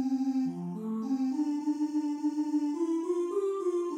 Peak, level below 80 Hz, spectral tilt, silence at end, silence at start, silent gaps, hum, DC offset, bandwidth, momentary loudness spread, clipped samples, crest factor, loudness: -20 dBFS; -88 dBFS; -7.5 dB/octave; 0 s; 0 s; none; none; under 0.1%; 10.5 kHz; 4 LU; under 0.1%; 10 dB; -31 LUFS